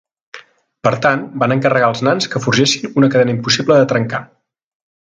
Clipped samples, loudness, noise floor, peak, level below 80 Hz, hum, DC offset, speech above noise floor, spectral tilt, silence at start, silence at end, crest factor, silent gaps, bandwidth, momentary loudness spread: under 0.1%; -14 LUFS; -40 dBFS; 0 dBFS; -56 dBFS; none; under 0.1%; 26 dB; -5 dB/octave; 0.35 s; 0.95 s; 16 dB; none; 9.2 kHz; 6 LU